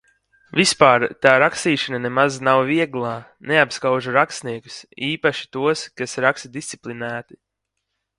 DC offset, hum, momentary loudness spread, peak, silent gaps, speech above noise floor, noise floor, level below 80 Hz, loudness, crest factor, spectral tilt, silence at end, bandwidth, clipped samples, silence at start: under 0.1%; none; 16 LU; 0 dBFS; none; 59 dB; -78 dBFS; -62 dBFS; -19 LUFS; 20 dB; -4 dB/octave; 0.95 s; 11.5 kHz; under 0.1%; 0.55 s